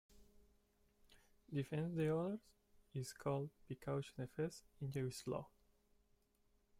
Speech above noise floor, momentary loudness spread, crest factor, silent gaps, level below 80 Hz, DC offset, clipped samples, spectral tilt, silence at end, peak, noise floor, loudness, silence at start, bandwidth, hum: 34 dB; 11 LU; 16 dB; none; -72 dBFS; under 0.1%; under 0.1%; -7 dB/octave; 1.3 s; -30 dBFS; -78 dBFS; -45 LUFS; 0.15 s; 16 kHz; none